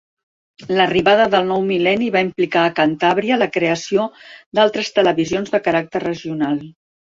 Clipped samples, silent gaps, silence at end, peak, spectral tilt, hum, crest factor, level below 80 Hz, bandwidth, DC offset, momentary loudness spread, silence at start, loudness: under 0.1%; 4.46-4.52 s; 0.5 s; -2 dBFS; -5 dB/octave; none; 16 dB; -56 dBFS; 7.6 kHz; under 0.1%; 8 LU; 0.6 s; -17 LUFS